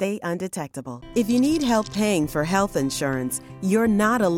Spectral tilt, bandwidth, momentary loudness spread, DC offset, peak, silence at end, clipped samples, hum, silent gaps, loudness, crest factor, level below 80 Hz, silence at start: -5 dB/octave; 17 kHz; 10 LU; under 0.1%; -6 dBFS; 0 s; under 0.1%; none; none; -23 LUFS; 16 dB; -48 dBFS; 0 s